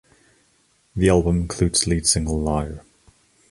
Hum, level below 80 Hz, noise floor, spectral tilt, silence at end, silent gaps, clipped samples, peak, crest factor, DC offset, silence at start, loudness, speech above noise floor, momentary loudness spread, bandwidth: none; -34 dBFS; -62 dBFS; -4.5 dB/octave; 0.7 s; none; under 0.1%; -4 dBFS; 20 dB; under 0.1%; 0.95 s; -20 LUFS; 42 dB; 14 LU; 11.5 kHz